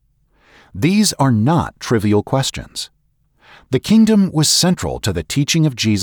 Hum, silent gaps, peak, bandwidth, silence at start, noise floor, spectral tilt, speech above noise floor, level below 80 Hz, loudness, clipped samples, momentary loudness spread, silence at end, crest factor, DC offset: none; none; -4 dBFS; over 20 kHz; 0.75 s; -58 dBFS; -4.5 dB/octave; 43 dB; -42 dBFS; -16 LUFS; under 0.1%; 11 LU; 0 s; 14 dB; under 0.1%